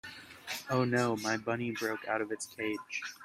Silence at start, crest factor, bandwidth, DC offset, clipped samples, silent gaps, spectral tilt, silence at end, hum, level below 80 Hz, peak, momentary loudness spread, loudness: 0.05 s; 20 dB; 16 kHz; under 0.1%; under 0.1%; none; -4.5 dB/octave; 0 s; none; -72 dBFS; -16 dBFS; 10 LU; -34 LUFS